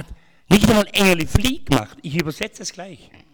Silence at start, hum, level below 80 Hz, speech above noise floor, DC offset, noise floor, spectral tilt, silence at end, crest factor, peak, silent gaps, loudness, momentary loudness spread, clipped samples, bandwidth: 0 s; none; -34 dBFS; 20 dB; under 0.1%; -39 dBFS; -5 dB/octave; 0.4 s; 18 dB; 0 dBFS; none; -18 LUFS; 16 LU; under 0.1%; over 20 kHz